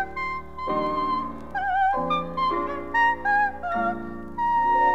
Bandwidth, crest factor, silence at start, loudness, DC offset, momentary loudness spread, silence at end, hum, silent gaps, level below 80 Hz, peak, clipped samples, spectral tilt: 8 kHz; 14 dB; 0 s; -25 LUFS; 0.9%; 9 LU; 0 s; none; none; -48 dBFS; -12 dBFS; under 0.1%; -6 dB/octave